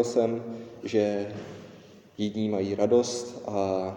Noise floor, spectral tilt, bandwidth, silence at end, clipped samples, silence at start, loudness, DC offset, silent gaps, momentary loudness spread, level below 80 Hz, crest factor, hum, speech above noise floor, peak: -50 dBFS; -5.5 dB/octave; 16 kHz; 0 s; under 0.1%; 0 s; -28 LUFS; under 0.1%; none; 19 LU; -70 dBFS; 18 dB; none; 23 dB; -10 dBFS